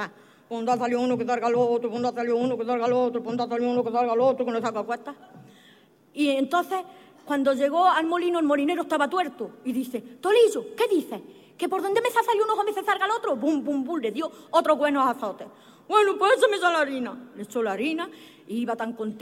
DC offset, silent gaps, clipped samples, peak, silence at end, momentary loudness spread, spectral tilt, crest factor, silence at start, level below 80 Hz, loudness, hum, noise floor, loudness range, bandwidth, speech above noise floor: under 0.1%; none; under 0.1%; -6 dBFS; 0 s; 12 LU; -4.5 dB/octave; 18 dB; 0 s; -74 dBFS; -25 LUFS; none; -56 dBFS; 3 LU; 16 kHz; 32 dB